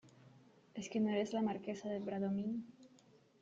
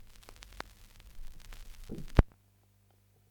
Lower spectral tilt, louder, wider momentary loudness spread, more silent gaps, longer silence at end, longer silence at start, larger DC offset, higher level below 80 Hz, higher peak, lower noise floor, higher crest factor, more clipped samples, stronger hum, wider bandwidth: about the same, -6.5 dB/octave vs -7 dB/octave; second, -40 LUFS vs -35 LUFS; second, 12 LU vs 25 LU; neither; second, 0.55 s vs 1.05 s; about the same, 0.05 s vs 0 s; neither; second, -80 dBFS vs -38 dBFS; second, -26 dBFS vs -2 dBFS; about the same, -67 dBFS vs -67 dBFS; second, 16 dB vs 34 dB; neither; second, none vs 50 Hz at -55 dBFS; second, 7.8 kHz vs 19 kHz